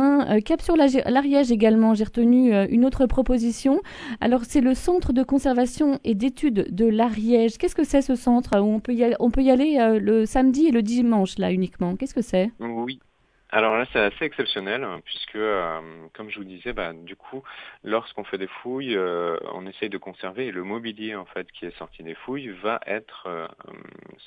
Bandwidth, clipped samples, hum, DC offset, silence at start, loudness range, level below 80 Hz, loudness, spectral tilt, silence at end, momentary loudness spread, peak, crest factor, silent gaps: 11 kHz; under 0.1%; none; under 0.1%; 0 s; 12 LU; -40 dBFS; -22 LUFS; -6 dB/octave; 0.8 s; 16 LU; -2 dBFS; 20 dB; none